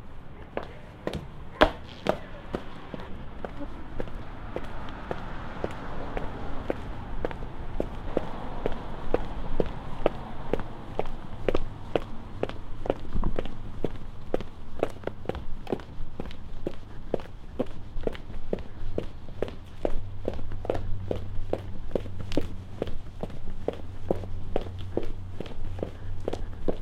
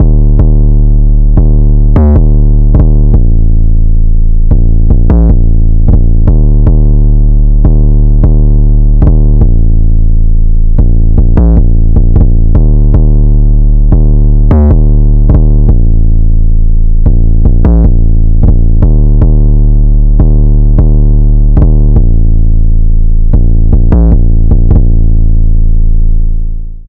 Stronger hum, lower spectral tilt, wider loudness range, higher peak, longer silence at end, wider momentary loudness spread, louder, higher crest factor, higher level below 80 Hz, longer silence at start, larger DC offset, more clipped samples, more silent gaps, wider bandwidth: neither; second, -7 dB/octave vs -13.5 dB/octave; first, 5 LU vs 1 LU; about the same, 0 dBFS vs 0 dBFS; about the same, 0 s vs 0.05 s; first, 9 LU vs 4 LU; second, -35 LUFS vs -9 LUFS; first, 28 dB vs 4 dB; second, -34 dBFS vs -4 dBFS; about the same, 0 s vs 0 s; second, under 0.1% vs 1%; second, under 0.1% vs 10%; neither; first, 5.6 kHz vs 1.6 kHz